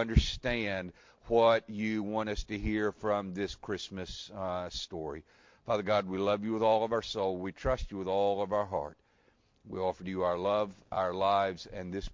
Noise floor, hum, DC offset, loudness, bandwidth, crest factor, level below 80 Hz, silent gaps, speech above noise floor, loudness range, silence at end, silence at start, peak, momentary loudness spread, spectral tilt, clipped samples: -69 dBFS; none; under 0.1%; -32 LUFS; 7.6 kHz; 22 dB; -44 dBFS; none; 37 dB; 4 LU; 0 s; 0 s; -10 dBFS; 11 LU; -6 dB/octave; under 0.1%